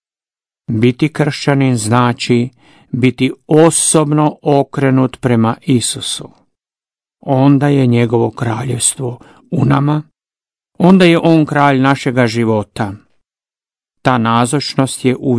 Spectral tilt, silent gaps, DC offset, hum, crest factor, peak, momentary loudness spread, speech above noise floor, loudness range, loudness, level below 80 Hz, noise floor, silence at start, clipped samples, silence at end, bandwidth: -5.5 dB/octave; none; under 0.1%; none; 14 dB; 0 dBFS; 10 LU; over 78 dB; 3 LU; -13 LUFS; -50 dBFS; under -90 dBFS; 0.7 s; 0.3%; 0 s; 11 kHz